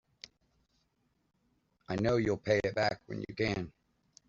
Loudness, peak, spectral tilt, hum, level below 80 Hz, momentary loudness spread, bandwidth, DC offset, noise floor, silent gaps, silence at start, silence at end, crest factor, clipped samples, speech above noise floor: -33 LUFS; -14 dBFS; -5 dB/octave; none; -60 dBFS; 21 LU; 7.6 kHz; under 0.1%; -77 dBFS; none; 1.9 s; 0.6 s; 22 dB; under 0.1%; 45 dB